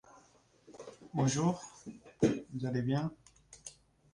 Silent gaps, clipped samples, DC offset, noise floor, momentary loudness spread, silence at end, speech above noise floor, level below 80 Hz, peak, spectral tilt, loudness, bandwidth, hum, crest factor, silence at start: none; under 0.1%; under 0.1%; -65 dBFS; 20 LU; 0.45 s; 32 dB; -66 dBFS; -16 dBFS; -6 dB/octave; -34 LUFS; 11 kHz; none; 22 dB; 0.7 s